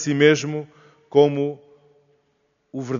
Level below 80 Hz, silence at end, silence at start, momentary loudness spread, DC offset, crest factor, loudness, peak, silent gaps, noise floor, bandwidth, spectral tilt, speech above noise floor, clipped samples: -68 dBFS; 0 s; 0 s; 22 LU; under 0.1%; 20 dB; -20 LUFS; -2 dBFS; none; -68 dBFS; 7.4 kHz; -5 dB/octave; 49 dB; under 0.1%